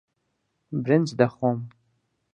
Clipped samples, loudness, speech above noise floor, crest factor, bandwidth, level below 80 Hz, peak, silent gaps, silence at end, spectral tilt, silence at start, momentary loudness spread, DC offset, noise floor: under 0.1%; -24 LUFS; 53 dB; 24 dB; 9 kHz; -68 dBFS; -4 dBFS; none; 0.65 s; -7.5 dB/octave; 0.7 s; 12 LU; under 0.1%; -75 dBFS